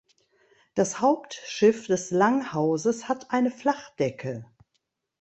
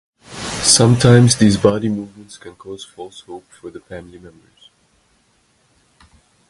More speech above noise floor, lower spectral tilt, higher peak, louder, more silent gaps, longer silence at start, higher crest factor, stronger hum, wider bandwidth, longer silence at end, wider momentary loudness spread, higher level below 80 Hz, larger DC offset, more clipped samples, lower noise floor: first, 52 dB vs 43 dB; about the same, -5 dB/octave vs -4.5 dB/octave; second, -8 dBFS vs 0 dBFS; second, -26 LUFS vs -13 LUFS; neither; first, 0.75 s vs 0.3 s; about the same, 18 dB vs 18 dB; neither; second, 8.4 kHz vs 11.5 kHz; second, 0.75 s vs 2.2 s; second, 11 LU vs 26 LU; second, -68 dBFS vs -44 dBFS; neither; neither; first, -77 dBFS vs -59 dBFS